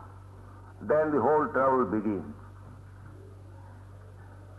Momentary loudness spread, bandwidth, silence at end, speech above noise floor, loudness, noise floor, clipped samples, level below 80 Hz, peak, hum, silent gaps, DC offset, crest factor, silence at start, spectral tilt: 24 LU; 11.5 kHz; 0 s; 21 dB; -27 LUFS; -48 dBFS; under 0.1%; -58 dBFS; -14 dBFS; none; none; under 0.1%; 16 dB; 0 s; -9.5 dB/octave